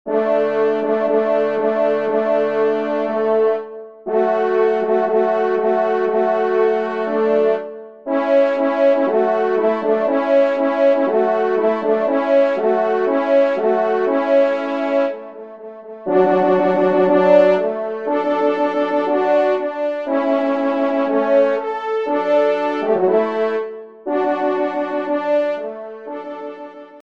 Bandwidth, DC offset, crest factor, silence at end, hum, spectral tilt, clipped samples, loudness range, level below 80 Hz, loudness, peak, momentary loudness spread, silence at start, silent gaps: 6.6 kHz; 0.3%; 16 dB; 0.15 s; none; -7 dB/octave; under 0.1%; 3 LU; -70 dBFS; -17 LUFS; 0 dBFS; 9 LU; 0.05 s; none